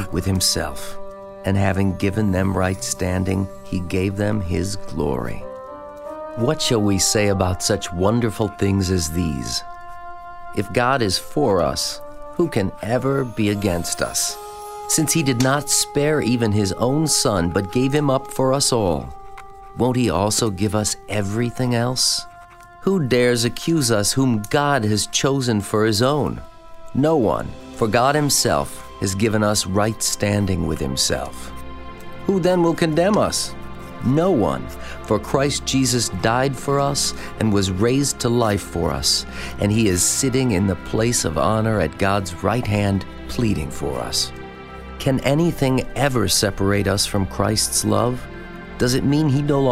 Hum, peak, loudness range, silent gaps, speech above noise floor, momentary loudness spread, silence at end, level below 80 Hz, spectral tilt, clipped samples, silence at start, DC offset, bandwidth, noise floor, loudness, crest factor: none; -2 dBFS; 3 LU; none; 23 dB; 14 LU; 0 s; -40 dBFS; -4.5 dB/octave; under 0.1%; 0 s; under 0.1%; 16 kHz; -43 dBFS; -20 LUFS; 18 dB